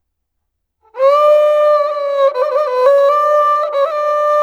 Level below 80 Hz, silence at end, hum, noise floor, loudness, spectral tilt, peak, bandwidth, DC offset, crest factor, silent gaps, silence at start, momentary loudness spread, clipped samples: -70 dBFS; 0 s; none; -72 dBFS; -12 LUFS; -0.5 dB/octave; 0 dBFS; 7.6 kHz; under 0.1%; 12 dB; none; 0.95 s; 5 LU; under 0.1%